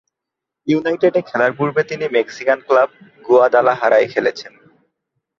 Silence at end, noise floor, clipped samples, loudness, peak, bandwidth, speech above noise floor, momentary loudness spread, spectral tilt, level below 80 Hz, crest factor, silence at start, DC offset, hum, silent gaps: 0.9 s; -83 dBFS; under 0.1%; -16 LUFS; 0 dBFS; 7.2 kHz; 67 dB; 7 LU; -6 dB/octave; -64 dBFS; 16 dB; 0.65 s; under 0.1%; none; none